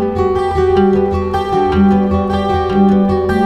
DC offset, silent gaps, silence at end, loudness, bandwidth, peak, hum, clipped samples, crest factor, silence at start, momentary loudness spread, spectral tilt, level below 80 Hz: under 0.1%; none; 0 s; -13 LUFS; 8.8 kHz; 0 dBFS; none; under 0.1%; 12 dB; 0 s; 4 LU; -8.5 dB/octave; -28 dBFS